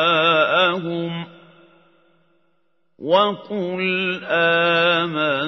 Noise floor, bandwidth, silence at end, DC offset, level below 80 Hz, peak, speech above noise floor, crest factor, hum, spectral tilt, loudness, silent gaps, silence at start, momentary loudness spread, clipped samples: -70 dBFS; 6.2 kHz; 0 s; under 0.1%; -72 dBFS; -4 dBFS; 50 dB; 18 dB; none; -6 dB/octave; -18 LUFS; none; 0 s; 12 LU; under 0.1%